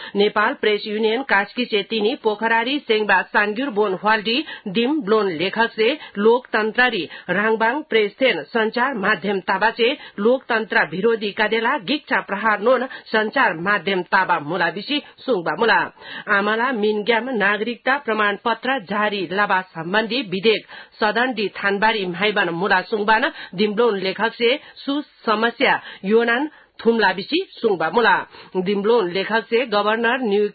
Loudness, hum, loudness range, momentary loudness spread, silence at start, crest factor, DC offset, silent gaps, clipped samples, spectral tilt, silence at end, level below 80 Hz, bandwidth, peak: -19 LUFS; none; 1 LU; 5 LU; 0 s; 16 dB; under 0.1%; none; under 0.1%; -9.5 dB/octave; 0.05 s; -64 dBFS; 4.8 kHz; -2 dBFS